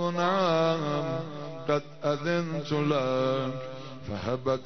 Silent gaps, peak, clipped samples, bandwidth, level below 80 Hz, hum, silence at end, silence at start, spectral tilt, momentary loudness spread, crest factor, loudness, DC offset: none; -14 dBFS; under 0.1%; 6.4 kHz; -62 dBFS; none; 0 s; 0 s; -6.5 dB/octave; 13 LU; 16 dB; -29 LUFS; 0.5%